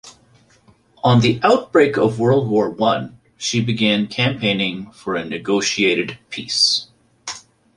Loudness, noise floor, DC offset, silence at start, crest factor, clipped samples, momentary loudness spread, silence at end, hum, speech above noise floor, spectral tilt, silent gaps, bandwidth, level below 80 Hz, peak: -18 LUFS; -54 dBFS; under 0.1%; 0.05 s; 18 dB; under 0.1%; 15 LU; 0.4 s; none; 36 dB; -4.5 dB/octave; none; 11.5 kHz; -54 dBFS; -2 dBFS